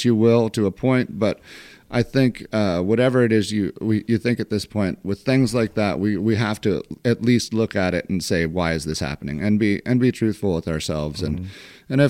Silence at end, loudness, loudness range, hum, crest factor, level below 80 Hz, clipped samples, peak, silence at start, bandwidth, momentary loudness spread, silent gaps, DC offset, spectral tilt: 0 s; -21 LUFS; 1 LU; none; 18 dB; -46 dBFS; under 0.1%; -2 dBFS; 0 s; 15.5 kHz; 8 LU; none; under 0.1%; -6.5 dB/octave